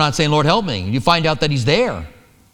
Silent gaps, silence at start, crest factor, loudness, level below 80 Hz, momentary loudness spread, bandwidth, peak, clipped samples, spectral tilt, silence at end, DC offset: none; 0 s; 16 dB; -16 LUFS; -38 dBFS; 6 LU; 13.5 kHz; 0 dBFS; under 0.1%; -5 dB/octave; 0.45 s; under 0.1%